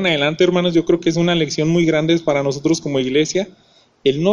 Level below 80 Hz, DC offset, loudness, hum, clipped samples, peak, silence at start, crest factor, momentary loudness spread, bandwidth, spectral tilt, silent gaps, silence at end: -48 dBFS; under 0.1%; -17 LUFS; none; under 0.1%; -2 dBFS; 0 s; 14 dB; 5 LU; 10.5 kHz; -5.5 dB/octave; none; 0 s